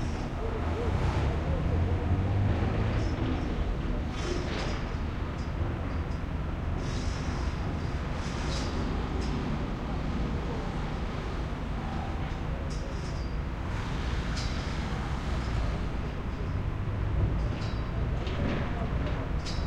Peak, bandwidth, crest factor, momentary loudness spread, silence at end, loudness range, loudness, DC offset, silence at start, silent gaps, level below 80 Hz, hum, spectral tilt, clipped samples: -16 dBFS; 10 kHz; 14 dB; 6 LU; 0 s; 4 LU; -32 LUFS; under 0.1%; 0 s; none; -34 dBFS; none; -6.5 dB/octave; under 0.1%